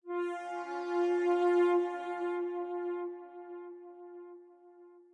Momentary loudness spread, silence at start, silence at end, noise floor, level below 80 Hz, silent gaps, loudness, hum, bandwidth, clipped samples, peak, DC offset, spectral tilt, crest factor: 22 LU; 0.05 s; 0.15 s; -57 dBFS; under -90 dBFS; none; -33 LUFS; none; 8.2 kHz; under 0.1%; -20 dBFS; under 0.1%; -4.5 dB/octave; 14 dB